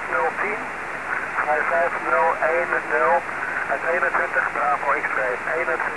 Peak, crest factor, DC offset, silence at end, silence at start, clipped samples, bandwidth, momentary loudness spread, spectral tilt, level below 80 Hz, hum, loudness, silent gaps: -8 dBFS; 14 dB; 0.4%; 0 s; 0 s; under 0.1%; 11 kHz; 6 LU; -4 dB/octave; -56 dBFS; none; -22 LUFS; none